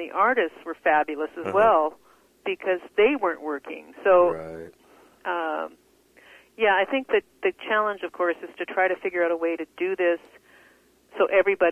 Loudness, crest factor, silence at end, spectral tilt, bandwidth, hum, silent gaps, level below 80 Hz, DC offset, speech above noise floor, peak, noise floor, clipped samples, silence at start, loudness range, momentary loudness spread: -24 LUFS; 18 dB; 0 s; -5.5 dB/octave; 10 kHz; none; none; -66 dBFS; under 0.1%; 34 dB; -6 dBFS; -58 dBFS; under 0.1%; 0 s; 4 LU; 13 LU